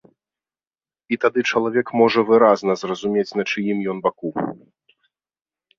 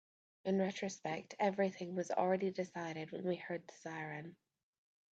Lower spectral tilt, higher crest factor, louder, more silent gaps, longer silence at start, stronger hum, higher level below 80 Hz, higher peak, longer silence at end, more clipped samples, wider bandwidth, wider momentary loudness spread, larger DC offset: about the same, -5.5 dB/octave vs -6 dB/octave; about the same, 20 dB vs 20 dB; first, -20 LUFS vs -40 LUFS; neither; first, 1.1 s vs 0.45 s; neither; first, -66 dBFS vs -86 dBFS; first, -2 dBFS vs -20 dBFS; first, 1.25 s vs 0.8 s; neither; about the same, 7.4 kHz vs 8 kHz; about the same, 12 LU vs 11 LU; neither